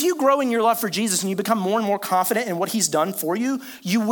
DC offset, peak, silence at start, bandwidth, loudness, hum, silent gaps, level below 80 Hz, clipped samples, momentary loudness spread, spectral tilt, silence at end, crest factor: under 0.1%; -6 dBFS; 0 s; 19.5 kHz; -21 LUFS; none; none; -72 dBFS; under 0.1%; 5 LU; -3.5 dB/octave; 0 s; 16 dB